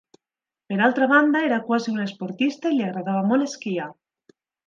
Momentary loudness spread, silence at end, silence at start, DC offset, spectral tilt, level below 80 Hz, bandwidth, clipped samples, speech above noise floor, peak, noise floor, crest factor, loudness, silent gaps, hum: 12 LU; 0.75 s; 0.7 s; under 0.1%; -6 dB/octave; -76 dBFS; 7.6 kHz; under 0.1%; over 68 dB; -4 dBFS; under -90 dBFS; 18 dB; -22 LUFS; none; none